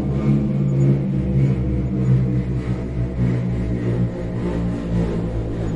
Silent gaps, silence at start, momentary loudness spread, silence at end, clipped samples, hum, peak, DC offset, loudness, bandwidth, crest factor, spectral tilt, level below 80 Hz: none; 0 s; 6 LU; 0 s; under 0.1%; none; -6 dBFS; under 0.1%; -21 LUFS; 7.4 kHz; 14 dB; -10 dB/octave; -30 dBFS